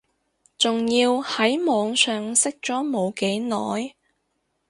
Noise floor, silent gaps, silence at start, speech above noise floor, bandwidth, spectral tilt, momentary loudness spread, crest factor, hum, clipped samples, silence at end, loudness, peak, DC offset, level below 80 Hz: -73 dBFS; none; 0.6 s; 51 dB; 11.5 kHz; -2.5 dB/octave; 7 LU; 20 dB; none; under 0.1%; 0.8 s; -22 LUFS; -4 dBFS; under 0.1%; -68 dBFS